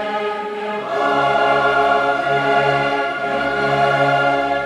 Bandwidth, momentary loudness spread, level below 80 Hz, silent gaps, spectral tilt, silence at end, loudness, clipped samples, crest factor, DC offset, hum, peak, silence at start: 12 kHz; 7 LU; -50 dBFS; none; -5.5 dB/octave; 0 s; -17 LUFS; under 0.1%; 14 dB; under 0.1%; none; -4 dBFS; 0 s